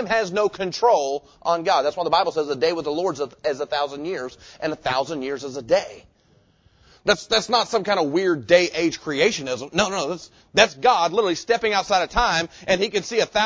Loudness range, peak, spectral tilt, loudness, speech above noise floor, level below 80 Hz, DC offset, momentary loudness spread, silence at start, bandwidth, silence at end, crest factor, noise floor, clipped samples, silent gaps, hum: 6 LU; -2 dBFS; -3 dB/octave; -22 LUFS; 37 dB; -48 dBFS; under 0.1%; 10 LU; 0 s; 8 kHz; 0 s; 20 dB; -59 dBFS; under 0.1%; none; none